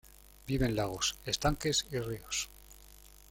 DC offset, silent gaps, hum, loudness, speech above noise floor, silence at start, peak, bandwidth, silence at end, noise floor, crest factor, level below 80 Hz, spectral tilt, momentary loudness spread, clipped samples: under 0.1%; none; none; -33 LUFS; 22 dB; 0.45 s; -14 dBFS; 17 kHz; 0.25 s; -56 dBFS; 20 dB; -48 dBFS; -3.5 dB/octave; 20 LU; under 0.1%